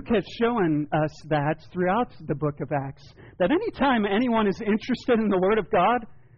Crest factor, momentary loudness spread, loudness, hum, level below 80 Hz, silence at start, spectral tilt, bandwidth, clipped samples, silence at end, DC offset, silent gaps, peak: 12 dB; 7 LU; -24 LUFS; none; -50 dBFS; 0 s; -5 dB/octave; 7 kHz; under 0.1%; 0.25 s; under 0.1%; none; -14 dBFS